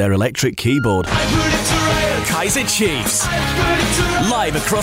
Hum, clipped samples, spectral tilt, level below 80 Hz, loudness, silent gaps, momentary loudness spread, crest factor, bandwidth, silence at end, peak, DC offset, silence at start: none; under 0.1%; -3.5 dB/octave; -30 dBFS; -16 LUFS; none; 2 LU; 10 dB; 16.5 kHz; 0 s; -6 dBFS; under 0.1%; 0 s